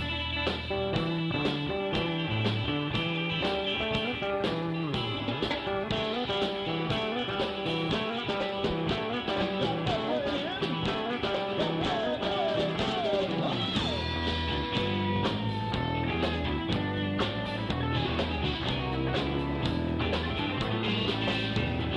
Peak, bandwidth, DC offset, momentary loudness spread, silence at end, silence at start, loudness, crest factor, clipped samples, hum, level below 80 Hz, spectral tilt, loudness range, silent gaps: -16 dBFS; 11 kHz; under 0.1%; 2 LU; 0 s; 0 s; -30 LUFS; 14 dB; under 0.1%; none; -44 dBFS; -6.5 dB/octave; 1 LU; none